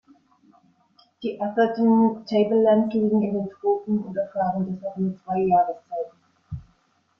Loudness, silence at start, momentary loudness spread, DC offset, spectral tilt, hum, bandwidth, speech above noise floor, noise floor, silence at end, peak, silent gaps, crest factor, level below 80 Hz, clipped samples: -23 LUFS; 1.2 s; 14 LU; under 0.1%; -9.5 dB/octave; none; 5.8 kHz; 43 dB; -65 dBFS; 0.55 s; -8 dBFS; none; 14 dB; -60 dBFS; under 0.1%